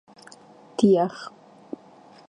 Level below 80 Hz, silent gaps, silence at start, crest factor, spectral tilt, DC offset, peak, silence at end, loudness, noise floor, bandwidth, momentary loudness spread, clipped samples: -70 dBFS; none; 0.8 s; 20 dB; -7 dB/octave; under 0.1%; -6 dBFS; 1 s; -21 LUFS; -51 dBFS; 10.5 kHz; 22 LU; under 0.1%